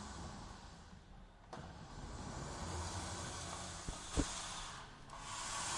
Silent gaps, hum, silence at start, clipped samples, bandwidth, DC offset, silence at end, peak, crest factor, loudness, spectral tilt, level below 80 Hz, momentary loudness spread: none; none; 0 s; under 0.1%; 11.5 kHz; under 0.1%; 0 s; -22 dBFS; 24 dB; -46 LUFS; -3 dB/octave; -54 dBFS; 15 LU